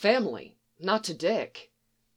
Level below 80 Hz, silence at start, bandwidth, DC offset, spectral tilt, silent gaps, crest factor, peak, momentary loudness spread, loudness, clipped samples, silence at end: -76 dBFS; 0 s; 14 kHz; under 0.1%; -4 dB/octave; none; 22 dB; -8 dBFS; 14 LU; -29 LUFS; under 0.1%; 0.55 s